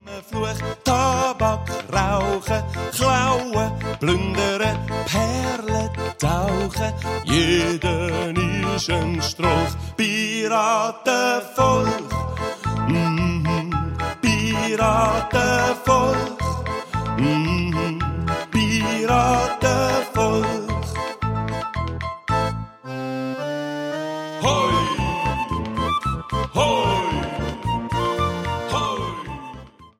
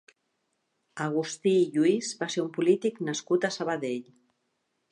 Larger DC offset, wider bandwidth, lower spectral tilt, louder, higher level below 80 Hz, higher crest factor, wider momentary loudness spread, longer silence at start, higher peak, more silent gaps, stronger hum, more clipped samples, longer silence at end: neither; first, 16 kHz vs 10.5 kHz; about the same, -5 dB/octave vs -5 dB/octave; first, -22 LUFS vs -28 LUFS; first, -36 dBFS vs -82 dBFS; about the same, 18 dB vs 18 dB; about the same, 8 LU vs 10 LU; second, 0.05 s vs 0.95 s; first, -4 dBFS vs -12 dBFS; neither; neither; neither; second, 0.1 s vs 0.9 s